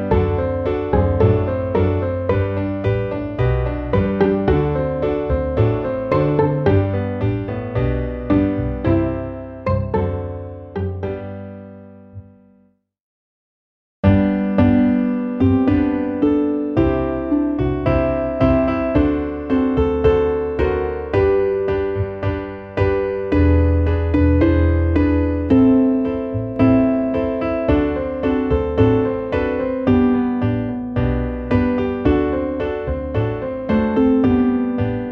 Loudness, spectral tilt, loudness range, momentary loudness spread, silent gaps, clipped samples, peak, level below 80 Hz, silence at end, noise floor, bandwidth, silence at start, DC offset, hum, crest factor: -18 LUFS; -10.5 dB/octave; 6 LU; 8 LU; 13.00-14.03 s; under 0.1%; -2 dBFS; -30 dBFS; 0 s; -58 dBFS; 5.6 kHz; 0 s; under 0.1%; none; 16 dB